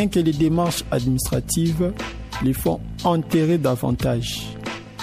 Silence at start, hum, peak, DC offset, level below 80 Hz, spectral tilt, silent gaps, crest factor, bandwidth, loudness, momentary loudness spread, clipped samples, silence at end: 0 s; none; -8 dBFS; under 0.1%; -38 dBFS; -5.5 dB/octave; none; 14 dB; 15.5 kHz; -22 LUFS; 10 LU; under 0.1%; 0 s